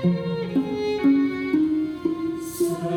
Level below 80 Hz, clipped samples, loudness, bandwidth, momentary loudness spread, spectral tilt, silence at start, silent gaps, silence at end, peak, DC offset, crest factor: -56 dBFS; under 0.1%; -24 LUFS; 18.5 kHz; 7 LU; -7 dB/octave; 0 s; none; 0 s; -10 dBFS; under 0.1%; 14 dB